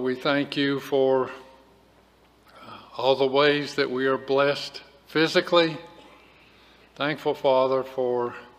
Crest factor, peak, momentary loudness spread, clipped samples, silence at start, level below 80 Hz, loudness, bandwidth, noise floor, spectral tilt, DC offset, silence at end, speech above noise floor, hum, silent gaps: 20 dB; -4 dBFS; 15 LU; under 0.1%; 0 s; -66 dBFS; -24 LUFS; 15 kHz; -58 dBFS; -5 dB/octave; under 0.1%; 0.15 s; 34 dB; none; none